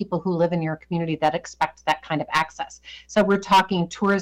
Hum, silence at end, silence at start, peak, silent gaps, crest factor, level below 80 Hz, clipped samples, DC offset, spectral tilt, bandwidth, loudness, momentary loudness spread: none; 0 s; 0 s; -10 dBFS; none; 12 dB; -54 dBFS; under 0.1%; under 0.1%; -5.5 dB/octave; 17.5 kHz; -23 LUFS; 9 LU